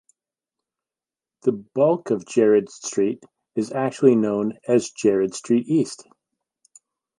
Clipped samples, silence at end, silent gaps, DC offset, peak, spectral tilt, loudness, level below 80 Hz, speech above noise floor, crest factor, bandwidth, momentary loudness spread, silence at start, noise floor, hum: under 0.1%; 1.25 s; none; under 0.1%; -4 dBFS; -6 dB/octave; -22 LUFS; -70 dBFS; over 69 dB; 20 dB; 11.5 kHz; 10 LU; 1.45 s; under -90 dBFS; none